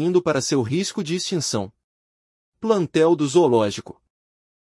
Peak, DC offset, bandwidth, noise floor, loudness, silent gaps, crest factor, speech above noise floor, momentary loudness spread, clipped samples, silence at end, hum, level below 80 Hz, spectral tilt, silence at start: -6 dBFS; under 0.1%; 12 kHz; under -90 dBFS; -21 LUFS; 1.84-2.52 s; 16 dB; over 70 dB; 11 LU; under 0.1%; 0.7 s; none; -64 dBFS; -5 dB/octave; 0 s